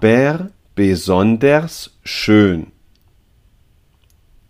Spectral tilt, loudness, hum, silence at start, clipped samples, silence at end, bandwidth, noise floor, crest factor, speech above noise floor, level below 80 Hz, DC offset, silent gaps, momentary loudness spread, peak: -6.5 dB/octave; -15 LUFS; none; 0 s; under 0.1%; 1.85 s; 15.5 kHz; -54 dBFS; 16 dB; 40 dB; -46 dBFS; under 0.1%; none; 15 LU; 0 dBFS